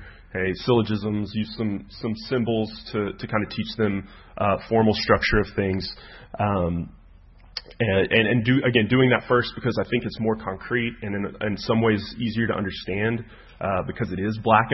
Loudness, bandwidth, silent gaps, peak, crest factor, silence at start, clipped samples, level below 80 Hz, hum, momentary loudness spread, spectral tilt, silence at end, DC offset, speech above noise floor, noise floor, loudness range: -24 LUFS; 6 kHz; none; -4 dBFS; 20 dB; 0 s; under 0.1%; -44 dBFS; none; 12 LU; -8 dB/octave; 0 s; under 0.1%; 26 dB; -49 dBFS; 4 LU